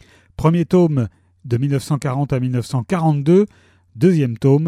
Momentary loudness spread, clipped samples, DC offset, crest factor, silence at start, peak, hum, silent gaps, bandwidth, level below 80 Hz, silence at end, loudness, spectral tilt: 7 LU; under 0.1%; under 0.1%; 14 dB; 0.4 s; -2 dBFS; none; none; 13.5 kHz; -48 dBFS; 0 s; -18 LUFS; -8.5 dB/octave